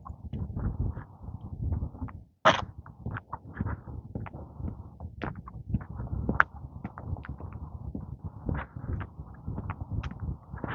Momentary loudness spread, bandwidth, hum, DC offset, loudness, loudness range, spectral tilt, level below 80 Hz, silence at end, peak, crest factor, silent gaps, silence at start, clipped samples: 16 LU; 7.2 kHz; none; under 0.1%; -35 LUFS; 7 LU; -6 dB/octave; -42 dBFS; 0 s; 0 dBFS; 34 dB; none; 0 s; under 0.1%